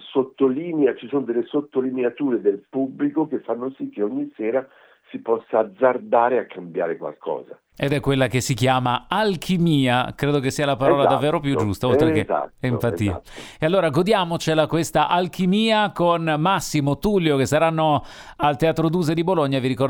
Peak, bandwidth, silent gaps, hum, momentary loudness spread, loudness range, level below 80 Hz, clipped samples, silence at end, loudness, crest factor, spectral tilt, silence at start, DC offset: -2 dBFS; 19 kHz; none; none; 8 LU; 4 LU; -48 dBFS; under 0.1%; 0 s; -21 LUFS; 18 dB; -6 dB/octave; 0 s; under 0.1%